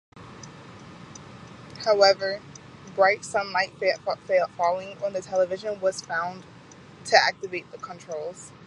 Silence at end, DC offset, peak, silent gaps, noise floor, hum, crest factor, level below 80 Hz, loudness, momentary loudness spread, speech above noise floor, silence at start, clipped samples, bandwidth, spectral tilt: 0 s; under 0.1%; -2 dBFS; none; -48 dBFS; none; 24 dB; -66 dBFS; -25 LUFS; 24 LU; 23 dB; 0.15 s; under 0.1%; 11 kHz; -2.5 dB/octave